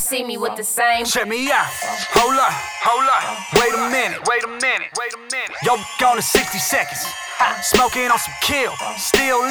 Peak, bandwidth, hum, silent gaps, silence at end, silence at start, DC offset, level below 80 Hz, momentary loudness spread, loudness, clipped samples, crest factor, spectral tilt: 0 dBFS; over 20 kHz; none; none; 0 s; 0 s; under 0.1%; -46 dBFS; 7 LU; -18 LUFS; under 0.1%; 18 dB; -1.5 dB/octave